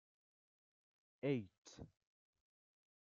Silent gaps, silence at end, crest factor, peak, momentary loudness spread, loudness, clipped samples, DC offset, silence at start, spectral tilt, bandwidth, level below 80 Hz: 1.58-1.62 s; 1.15 s; 22 dB; -28 dBFS; 18 LU; -44 LUFS; under 0.1%; under 0.1%; 1.25 s; -7 dB/octave; 7.4 kHz; -82 dBFS